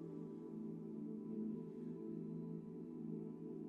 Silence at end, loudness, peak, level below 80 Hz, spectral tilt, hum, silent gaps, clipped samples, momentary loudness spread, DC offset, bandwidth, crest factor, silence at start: 0 s; -49 LUFS; -36 dBFS; -84 dBFS; -11 dB/octave; none; none; under 0.1%; 4 LU; under 0.1%; 4.1 kHz; 12 dB; 0 s